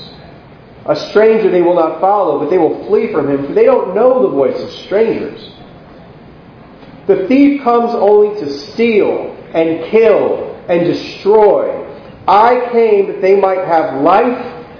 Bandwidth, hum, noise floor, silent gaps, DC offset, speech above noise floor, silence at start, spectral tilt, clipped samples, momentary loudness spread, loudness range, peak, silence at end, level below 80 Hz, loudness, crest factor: 5.4 kHz; none; -37 dBFS; none; under 0.1%; 26 dB; 0 s; -7.5 dB/octave; 0.1%; 11 LU; 4 LU; 0 dBFS; 0 s; -50 dBFS; -12 LUFS; 12 dB